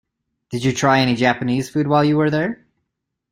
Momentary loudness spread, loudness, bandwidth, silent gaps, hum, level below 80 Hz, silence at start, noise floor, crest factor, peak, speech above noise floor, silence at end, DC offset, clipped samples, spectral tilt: 9 LU; -18 LUFS; 16 kHz; none; none; -54 dBFS; 0.5 s; -78 dBFS; 18 dB; -2 dBFS; 60 dB; 0.8 s; under 0.1%; under 0.1%; -5.5 dB/octave